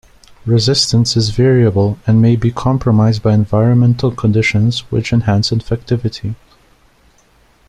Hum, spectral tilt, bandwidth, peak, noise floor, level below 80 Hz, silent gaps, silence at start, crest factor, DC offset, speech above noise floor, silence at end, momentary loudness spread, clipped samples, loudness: none; -6 dB/octave; 11 kHz; 0 dBFS; -51 dBFS; -38 dBFS; none; 0.45 s; 14 dB; under 0.1%; 39 dB; 1.35 s; 7 LU; under 0.1%; -13 LUFS